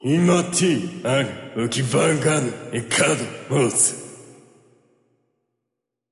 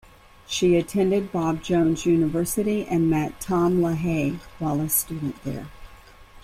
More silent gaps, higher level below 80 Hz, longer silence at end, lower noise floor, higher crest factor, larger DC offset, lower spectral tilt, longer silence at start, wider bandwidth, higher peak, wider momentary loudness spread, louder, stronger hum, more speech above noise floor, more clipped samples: neither; second, -60 dBFS vs -46 dBFS; first, 1.8 s vs 0.05 s; first, -82 dBFS vs -47 dBFS; about the same, 16 dB vs 16 dB; neither; second, -4 dB/octave vs -5.5 dB/octave; second, 0 s vs 0.5 s; second, 11.5 kHz vs 16 kHz; about the same, -6 dBFS vs -8 dBFS; about the same, 9 LU vs 10 LU; first, -20 LUFS vs -23 LUFS; neither; first, 61 dB vs 24 dB; neither